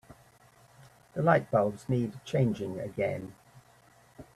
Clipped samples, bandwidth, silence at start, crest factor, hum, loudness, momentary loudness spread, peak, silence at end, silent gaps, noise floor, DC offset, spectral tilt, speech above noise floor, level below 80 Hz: under 0.1%; 13.5 kHz; 0.1 s; 22 dB; none; -30 LUFS; 13 LU; -10 dBFS; 0.1 s; none; -60 dBFS; under 0.1%; -8 dB/octave; 31 dB; -64 dBFS